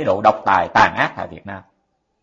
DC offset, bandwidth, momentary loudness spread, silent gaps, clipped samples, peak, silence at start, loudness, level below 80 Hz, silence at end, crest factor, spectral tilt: under 0.1%; 7.6 kHz; 20 LU; none; under 0.1%; 0 dBFS; 0 s; -16 LUFS; -50 dBFS; 0.65 s; 18 dB; -5 dB/octave